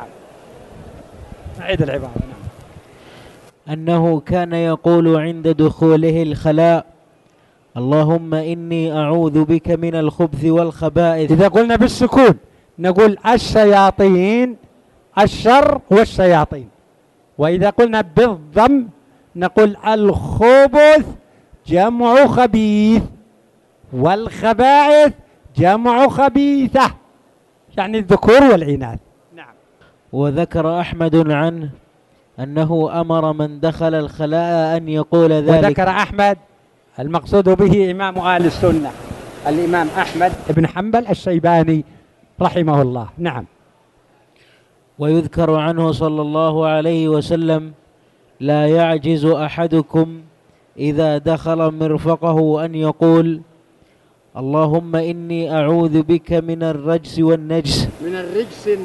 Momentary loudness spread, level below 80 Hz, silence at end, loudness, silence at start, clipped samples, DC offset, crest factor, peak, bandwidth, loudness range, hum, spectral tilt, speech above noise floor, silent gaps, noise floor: 12 LU; -40 dBFS; 0 s; -15 LUFS; 0 s; under 0.1%; under 0.1%; 16 dB; 0 dBFS; 12 kHz; 6 LU; none; -7.5 dB/octave; 40 dB; none; -54 dBFS